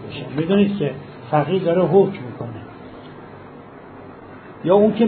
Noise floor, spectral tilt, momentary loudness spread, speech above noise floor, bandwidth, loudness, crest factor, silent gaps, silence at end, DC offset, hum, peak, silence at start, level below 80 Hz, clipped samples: -39 dBFS; -12 dB/octave; 24 LU; 22 dB; 4.5 kHz; -19 LUFS; 18 dB; none; 0 s; under 0.1%; none; -2 dBFS; 0 s; -58 dBFS; under 0.1%